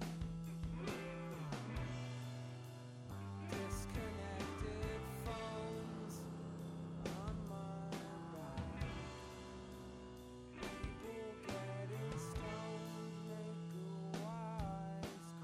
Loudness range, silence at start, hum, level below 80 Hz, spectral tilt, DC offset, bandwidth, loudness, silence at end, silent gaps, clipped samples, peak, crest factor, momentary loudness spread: 3 LU; 0 s; none; -56 dBFS; -6 dB/octave; under 0.1%; 16 kHz; -47 LUFS; 0 s; none; under 0.1%; -30 dBFS; 16 dB; 7 LU